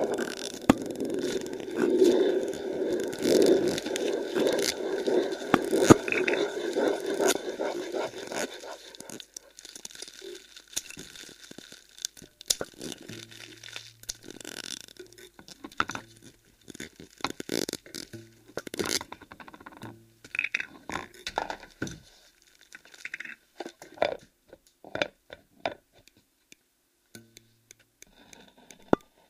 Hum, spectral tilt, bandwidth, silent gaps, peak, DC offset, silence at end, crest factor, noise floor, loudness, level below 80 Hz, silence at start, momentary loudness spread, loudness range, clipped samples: none; -4 dB/octave; 15.5 kHz; none; 0 dBFS; under 0.1%; 0.3 s; 30 dB; -71 dBFS; -29 LUFS; -60 dBFS; 0 s; 21 LU; 15 LU; under 0.1%